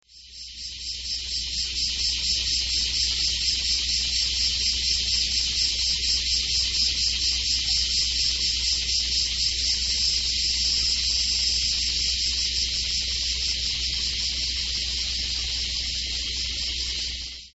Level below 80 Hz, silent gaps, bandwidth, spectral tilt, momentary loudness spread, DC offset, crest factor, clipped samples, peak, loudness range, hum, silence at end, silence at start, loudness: -38 dBFS; none; 8.2 kHz; 0.5 dB/octave; 5 LU; under 0.1%; 16 dB; under 0.1%; -8 dBFS; 3 LU; none; 0.05 s; 0.15 s; -22 LUFS